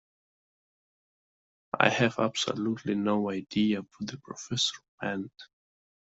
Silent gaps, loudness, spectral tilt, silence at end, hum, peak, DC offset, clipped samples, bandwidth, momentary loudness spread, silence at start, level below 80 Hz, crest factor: 4.88-4.98 s; -29 LUFS; -4.5 dB/octave; 0.65 s; none; -4 dBFS; under 0.1%; under 0.1%; 8 kHz; 14 LU; 1.75 s; -70 dBFS; 28 dB